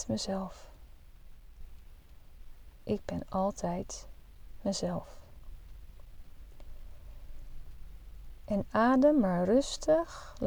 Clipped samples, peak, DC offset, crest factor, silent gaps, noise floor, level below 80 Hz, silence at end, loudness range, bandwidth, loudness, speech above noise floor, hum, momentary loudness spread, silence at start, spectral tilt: under 0.1%; -14 dBFS; under 0.1%; 20 dB; none; -52 dBFS; -48 dBFS; 0 s; 15 LU; over 20 kHz; -31 LUFS; 22 dB; none; 28 LU; 0 s; -5.5 dB/octave